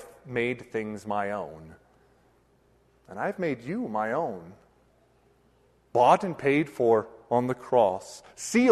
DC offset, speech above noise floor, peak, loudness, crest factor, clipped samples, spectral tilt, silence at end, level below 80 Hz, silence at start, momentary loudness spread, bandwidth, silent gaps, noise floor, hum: under 0.1%; 37 dB; -6 dBFS; -27 LUFS; 22 dB; under 0.1%; -5.5 dB/octave; 0 s; -66 dBFS; 0 s; 14 LU; 13 kHz; none; -64 dBFS; none